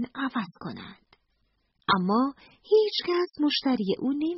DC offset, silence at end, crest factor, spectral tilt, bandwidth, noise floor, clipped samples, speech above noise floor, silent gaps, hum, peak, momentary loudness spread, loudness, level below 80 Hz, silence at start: under 0.1%; 0 s; 20 dB; -3.5 dB/octave; 6 kHz; -72 dBFS; under 0.1%; 47 dB; none; none; -8 dBFS; 16 LU; -26 LUFS; -66 dBFS; 0 s